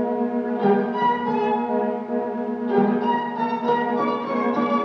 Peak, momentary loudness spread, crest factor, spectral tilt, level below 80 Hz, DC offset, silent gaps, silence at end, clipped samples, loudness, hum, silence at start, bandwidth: -8 dBFS; 5 LU; 14 dB; -8 dB/octave; -72 dBFS; under 0.1%; none; 0 s; under 0.1%; -22 LUFS; none; 0 s; 6.2 kHz